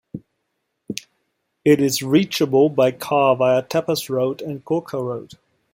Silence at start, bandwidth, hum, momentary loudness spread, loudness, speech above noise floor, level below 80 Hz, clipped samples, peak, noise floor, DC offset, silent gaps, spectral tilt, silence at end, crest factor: 0.15 s; 16.5 kHz; none; 16 LU; -19 LUFS; 56 dB; -62 dBFS; under 0.1%; -2 dBFS; -75 dBFS; under 0.1%; none; -5.5 dB/octave; 0.5 s; 18 dB